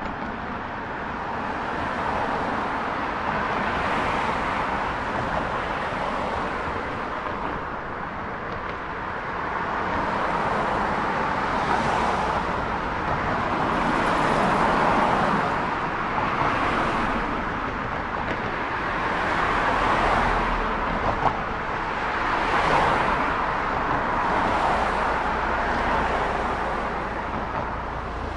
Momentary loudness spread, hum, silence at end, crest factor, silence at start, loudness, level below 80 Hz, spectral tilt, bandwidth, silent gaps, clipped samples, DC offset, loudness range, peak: 8 LU; none; 0 s; 18 dB; 0 s; -25 LUFS; -38 dBFS; -5.5 dB/octave; 11.5 kHz; none; under 0.1%; under 0.1%; 5 LU; -6 dBFS